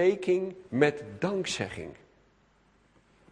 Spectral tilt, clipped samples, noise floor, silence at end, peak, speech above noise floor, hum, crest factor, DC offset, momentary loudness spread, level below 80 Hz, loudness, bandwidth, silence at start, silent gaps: -5 dB/octave; under 0.1%; -65 dBFS; 1.4 s; -8 dBFS; 36 dB; none; 24 dB; under 0.1%; 11 LU; -64 dBFS; -29 LUFS; 10.5 kHz; 0 s; none